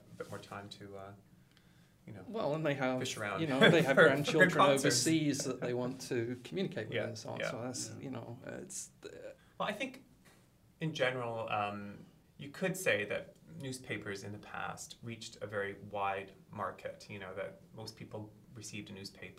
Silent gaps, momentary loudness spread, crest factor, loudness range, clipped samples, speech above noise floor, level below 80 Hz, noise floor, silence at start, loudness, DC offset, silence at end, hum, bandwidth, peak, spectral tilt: none; 22 LU; 24 dB; 13 LU; under 0.1%; 30 dB; -72 dBFS; -65 dBFS; 0.1 s; -34 LUFS; under 0.1%; 0.05 s; none; 16 kHz; -12 dBFS; -4 dB/octave